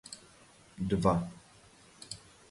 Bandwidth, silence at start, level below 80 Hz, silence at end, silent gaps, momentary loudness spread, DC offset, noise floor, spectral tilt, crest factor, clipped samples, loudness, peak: 11.5 kHz; 0.05 s; -54 dBFS; 0.35 s; none; 24 LU; under 0.1%; -59 dBFS; -6.5 dB/octave; 24 dB; under 0.1%; -32 LUFS; -12 dBFS